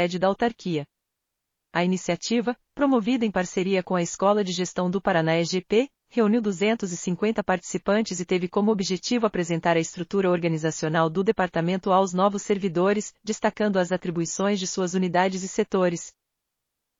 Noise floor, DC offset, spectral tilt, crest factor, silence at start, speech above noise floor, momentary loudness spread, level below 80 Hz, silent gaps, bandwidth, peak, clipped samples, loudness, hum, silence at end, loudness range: -82 dBFS; under 0.1%; -5 dB/octave; 16 dB; 0 s; 59 dB; 5 LU; -60 dBFS; none; 7.6 kHz; -8 dBFS; under 0.1%; -24 LUFS; none; 0.9 s; 2 LU